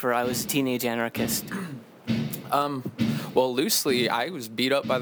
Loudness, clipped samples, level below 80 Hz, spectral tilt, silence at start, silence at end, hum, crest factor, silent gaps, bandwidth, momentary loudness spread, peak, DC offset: -26 LUFS; under 0.1%; -60 dBFS; -4 dB/octave; 0 s; 0 s; none; 18 dB; none; over 20 kHz; 8 LU; -8 dBFS; under 0.1%